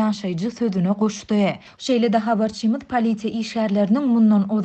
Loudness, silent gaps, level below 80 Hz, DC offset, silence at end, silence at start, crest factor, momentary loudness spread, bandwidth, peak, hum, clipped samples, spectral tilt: -21 LUFS; none; -58 dBFS; under 0.1%; 0 s; 0 s; 12 dB; 8 LU; 8.4 kHz; -6 dBFS; none; under 0.1%; -6.5 dB/octave